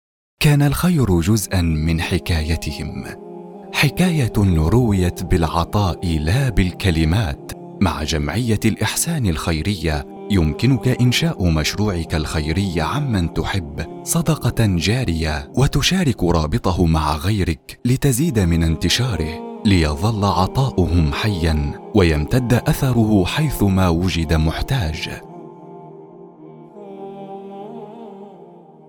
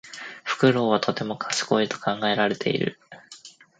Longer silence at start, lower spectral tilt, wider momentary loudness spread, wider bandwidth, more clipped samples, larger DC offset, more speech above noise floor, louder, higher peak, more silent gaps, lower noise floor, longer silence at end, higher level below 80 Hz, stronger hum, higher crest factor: first, 0.4 s vs 0.05 s; about the same, -5.5 dB/octave vs -4.5 dB/octave; second, 17 LU vs 21 LU; first, 19.5 kHz vs 9.4 kHz; neither; neither; about the same, 25 dB vs 25 dB; first, -19 LUFS vs -24 LUFS; first, -2 dBFS vs -6 dBFS; neither; second, -42 dBFS vs -48 dBFS; about the same, 0.35 s vs 0.3 s; first, -32 dBFS vs -68 dBFS; neither; about the same, 16 dB vs 20 dB